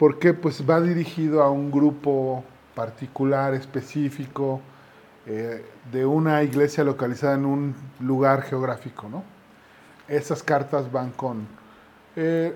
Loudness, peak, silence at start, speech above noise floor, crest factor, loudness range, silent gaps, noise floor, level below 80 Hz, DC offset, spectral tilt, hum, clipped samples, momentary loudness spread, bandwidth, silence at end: -24 LUFS; -4 dBFS; 0 s; 28 dB; 20 dB; 5 LU; none; -51 dBFS; -68 dBFS; under 0.1%; -7.5 dB/octave; none; under 0.1%; 13 LU; 17 kHz; 0 s